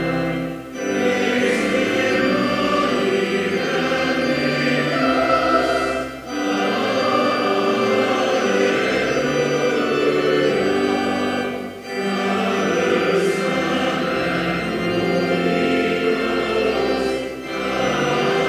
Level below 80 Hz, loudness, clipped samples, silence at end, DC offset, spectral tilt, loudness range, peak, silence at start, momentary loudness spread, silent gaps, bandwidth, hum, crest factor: -48 dBFS; -19 LUFS; under 0.1%; 0 s; under 0.1%; -5 dB/octave; 2 LU; -4 dBFS; 0 s; 6 LU; none; 16 kHz; none; 14 dB